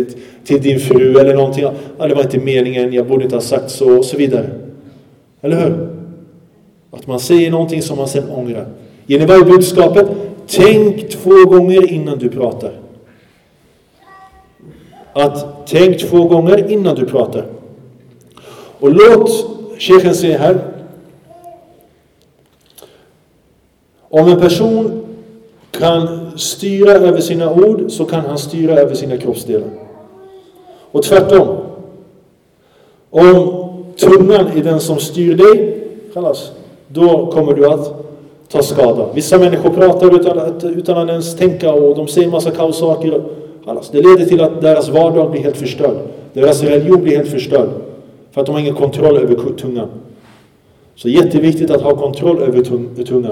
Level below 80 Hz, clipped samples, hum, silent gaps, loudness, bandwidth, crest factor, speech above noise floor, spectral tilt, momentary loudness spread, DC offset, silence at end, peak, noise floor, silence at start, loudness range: -48 dBFS; 0.4%; none; none; -11 LUFS; 16 kHz; 12 dB; 43 dB; -6 dB/octave; 16 LU; under 0.1%; 0 s; 0 dBFS; -53 dBFS; 0 s; 6 LU